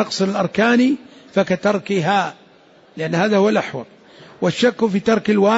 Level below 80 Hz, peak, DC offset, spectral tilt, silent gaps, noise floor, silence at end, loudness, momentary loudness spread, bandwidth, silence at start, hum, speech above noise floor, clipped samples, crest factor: -60 dBFS; -4 dBFS; under 0.1%; -5.5 dB/octave; none; -49 dBFS; 0 s; -18 LUFS; 10 LU; 8 kHz; 0 s; none; 32 dB; under 0.1%; 14 dB